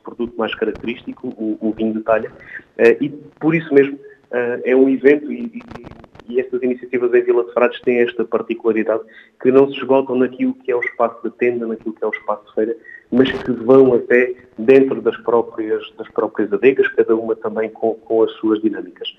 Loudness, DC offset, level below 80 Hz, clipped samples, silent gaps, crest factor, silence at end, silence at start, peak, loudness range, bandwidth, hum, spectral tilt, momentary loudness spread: -17 LUFS; under 0.1%; -56 dBFS; under 0.1%; none; 18 dB; 0.05 s; 0.05 s; 0 dBFS; 4 LU; 5.6 kHz; none; -8 dB/octave; 12 LU